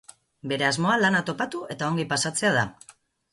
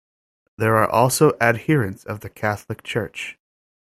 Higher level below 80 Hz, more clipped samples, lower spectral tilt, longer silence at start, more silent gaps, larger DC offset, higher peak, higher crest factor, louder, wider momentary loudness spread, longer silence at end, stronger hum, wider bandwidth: second, -64 dBFS vs -56 dBFS; neither; about the same, -4 dB/octave vs -5 dB/octave; second, 0.45 s vs 0.6 s; neither; neither; second, -8 dBFS vs -2 dBFS; about the same, 18 dB vs 20 dB; second, -24 LUFS vs -20 LUFS; second, 10 LU vs 15 LU; second, 0.4 s vs 0.6 s; neither; second, 11.5 kHz vs 16 kHz